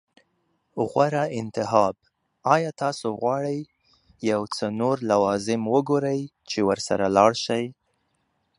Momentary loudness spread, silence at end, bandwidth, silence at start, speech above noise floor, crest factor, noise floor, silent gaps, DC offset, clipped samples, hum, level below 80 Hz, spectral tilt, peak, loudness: 9 LU; 0.85 s; 11.5 kHz; 0.75 s; 49 dB; 22 dB; -72 dBFS; none; under 0.1%; under 0.1%; none; -62 dBFS; -5.5 dB/octave; -2 dBFS; -24 LUFS